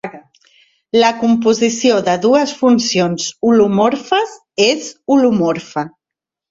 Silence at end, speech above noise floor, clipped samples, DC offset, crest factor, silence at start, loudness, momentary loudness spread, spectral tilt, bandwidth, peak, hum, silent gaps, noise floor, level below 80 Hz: 0.6 s; 71 dB; under 0.1%; under 0.1%; 14 dB; 0.05 s; -14 LUFS; 9 LU; -4.5 dB/octave; 7.8 kHz; -2 dBFS; none; none; -85 dBFS; -58 dBFS